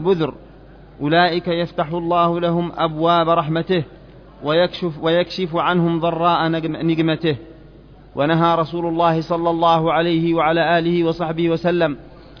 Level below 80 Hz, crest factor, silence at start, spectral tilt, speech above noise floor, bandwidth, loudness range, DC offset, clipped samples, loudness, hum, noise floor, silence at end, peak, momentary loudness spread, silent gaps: -48 dBFS; 16 dB; 0 s; -8 dB/octave; 25 dB; 5.4 kHz; 2 LU; under 0.1%; under 0.1%; -18 LUFS; none; -43 dBFS; 0.05 s; -2 dBFS; 6 LU; none